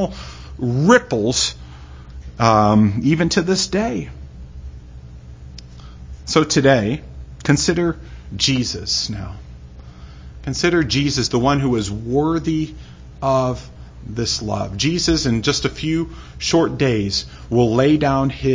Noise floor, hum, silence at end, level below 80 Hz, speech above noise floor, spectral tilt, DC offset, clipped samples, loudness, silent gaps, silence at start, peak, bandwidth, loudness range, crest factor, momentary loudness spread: -38 dBFS; none; 0 s; -36 dBFS; 20 dB; -5 dB/octave; under 0.1%; under 0.1%; -18 LUFS; none; 0 s; 0 dBFS; 7.8 kHz; 4 LU; 20 dB; 23 LU